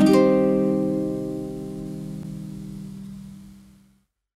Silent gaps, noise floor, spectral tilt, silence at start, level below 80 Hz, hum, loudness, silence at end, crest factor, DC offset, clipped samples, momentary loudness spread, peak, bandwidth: none; -62 dBFS; -7.5 dB/octave; 0 s; -50 dBFS; none; -23 LUFS; 0.8 s; 18 dB; under 0.1%; under 0.1%; 21 LU; -6 dBFS; 14 kHz